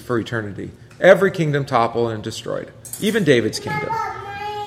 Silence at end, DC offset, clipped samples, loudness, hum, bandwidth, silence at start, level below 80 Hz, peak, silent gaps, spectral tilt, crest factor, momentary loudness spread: 0 s; under 0.1%; under 0.1%; -19 LUFS; none; 16 kHz; 0 s; -52 dBFS; 0 dBFS; none; -5.5 dB/octave; 20 dB; 15 LU